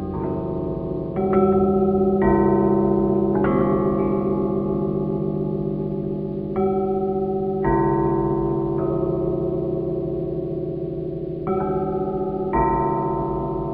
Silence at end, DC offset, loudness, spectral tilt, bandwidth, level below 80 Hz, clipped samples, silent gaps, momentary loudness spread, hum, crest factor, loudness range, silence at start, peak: 0 s; under 0.1%; -22 LUFS; -12 dB/octave; 4 kHz; -40 dBFS; under 0.1%; none; 8 LU; none; 16 dB; 6 LU; 0 s; -6 dBFS